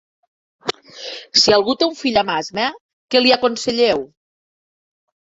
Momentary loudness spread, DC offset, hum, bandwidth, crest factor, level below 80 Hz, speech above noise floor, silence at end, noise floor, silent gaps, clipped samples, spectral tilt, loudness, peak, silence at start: 16 LU; under 0.1%; none; 8 kHz; 18 dB; -56 dBFS; over 74 dB; 1.2 s; under -90 dBFS; 2.81-3.08 s; under 0.1%; -2.5 dB/octave; -17 LUFS; -2 dBFS; 0.65 s